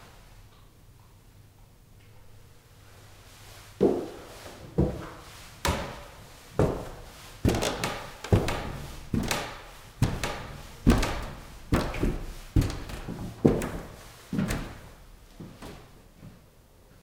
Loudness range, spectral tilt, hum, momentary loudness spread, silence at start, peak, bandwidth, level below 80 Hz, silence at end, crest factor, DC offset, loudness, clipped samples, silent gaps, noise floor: 6 LU; -5.5 dB/octave; none; 22 LU; 0 s; -2 dBFS; 17.5 kHz; -38 dBFS; 0.65 s; 28 dB; under 0.1%; -30 LUFS; under 0.1%; none; -56 dBFS